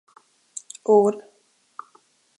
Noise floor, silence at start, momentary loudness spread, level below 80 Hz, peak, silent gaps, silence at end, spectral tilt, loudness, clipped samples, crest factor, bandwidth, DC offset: -63 dBFS; 0.9 s; 25 LU; -80 dBFS; -6 dBFS; none; 1.2 s; -6 dB/octave; -20 LUFS; under 0.1%; 20 dB; 11.5 kHz; under 0.1%